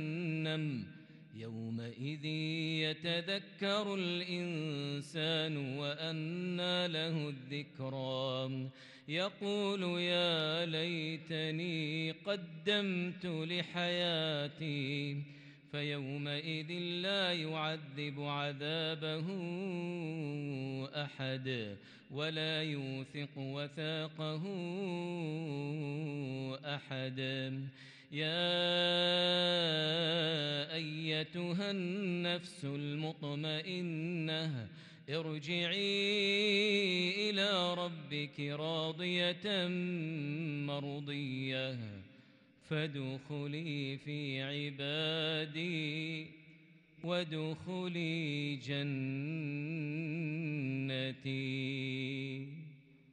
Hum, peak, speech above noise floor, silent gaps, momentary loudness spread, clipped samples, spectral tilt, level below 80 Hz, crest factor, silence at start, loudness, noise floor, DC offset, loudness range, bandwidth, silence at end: none; -20 dBFS; 26 dB; none; 10 LU; under 0.1%; -5.5 dB/octave; -82 dBFS; 16 dB; 0 s; -37 LUFS; -63 dBFS; under 0.1%; 7 LU; 10.5 kHz; 0.3 s